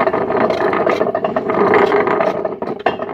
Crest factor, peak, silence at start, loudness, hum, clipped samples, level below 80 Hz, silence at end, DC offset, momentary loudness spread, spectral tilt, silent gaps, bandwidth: 16 dB; 0 dBFS; 0 s; -16 LUFS; none; under 0.1%; -52 dBFS; 0 s; under 0.1%; 8 LU; -7 dB/octave; none; 7.6 kHz